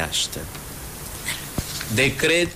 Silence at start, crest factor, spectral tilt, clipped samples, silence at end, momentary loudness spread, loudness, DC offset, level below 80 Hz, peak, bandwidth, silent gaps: 0 s; 14 dB; -3 dB/octave; under 0.1%; 0 s; 15 LU; -24 LUFS; under 0.1%; -42 dBFS; -10 dBFS; 16 kHz; none